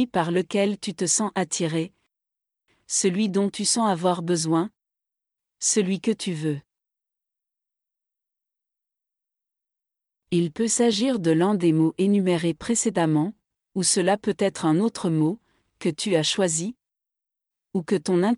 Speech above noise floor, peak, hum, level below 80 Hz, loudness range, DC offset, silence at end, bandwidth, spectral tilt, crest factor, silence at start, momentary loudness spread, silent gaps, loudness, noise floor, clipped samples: 65 dB; -8 dBFS; none; -66 dBFS; 6 LU; under 0.1%; 0 s; 12 kHz; -4.5 dB/octave; 16 dB; 0 s; 8 LU; none; -23 LUFS; -87 dBFS; under 0.1%